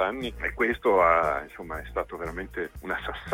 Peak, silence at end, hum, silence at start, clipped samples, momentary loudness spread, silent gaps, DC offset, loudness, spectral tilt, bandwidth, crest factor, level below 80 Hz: -8 dBFS; 0 s; none; 0 s; under 0.1%; 14 LU; none; under 0.1%; -27 LUFS; -6 dB/octave; 16.5 kHz; 18 dB; -44 dBFS